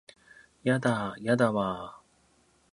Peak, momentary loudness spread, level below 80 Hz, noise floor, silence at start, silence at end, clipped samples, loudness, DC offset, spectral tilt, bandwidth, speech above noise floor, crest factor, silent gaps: -10 dBFS; 11 LU; -64 dBFS; -66 dBFS; 0.65 s; 0.75 s; under 0.1%; -28 LUFS; under 0.1%; -6.5 dB/octave; 11 kHz; 38 dB; 20 dB; none